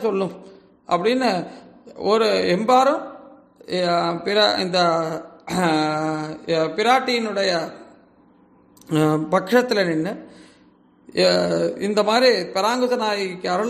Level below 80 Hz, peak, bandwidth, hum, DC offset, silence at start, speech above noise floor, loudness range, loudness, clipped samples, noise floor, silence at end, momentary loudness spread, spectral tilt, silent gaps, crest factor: -64 dBFS; -4 dBFS; 14.5 kHz; none; under 0.1%; 0 s; 34 dB; 3 LU; -20 LUFS; under 0.1%; -54 dBFS; 0 s; 11 LU; -5 dB/octave; none; 18 dB